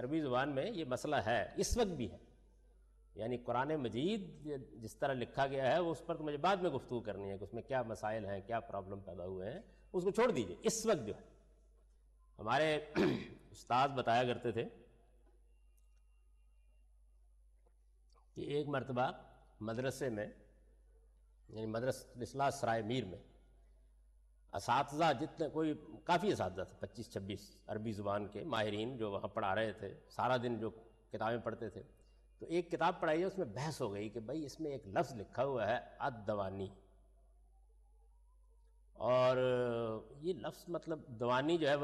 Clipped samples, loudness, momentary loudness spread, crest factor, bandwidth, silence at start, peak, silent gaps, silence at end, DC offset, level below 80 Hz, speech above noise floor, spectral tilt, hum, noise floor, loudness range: under 0.1%; -39 LUFS; 13 LU; 16 dB; 13 kHz; 0 s; -24 dBFS; none; 0 s; under 0.1%; -62 dBFS; 30 dB; -5.5 dB/octave; none; -68 dBFS; 5 LU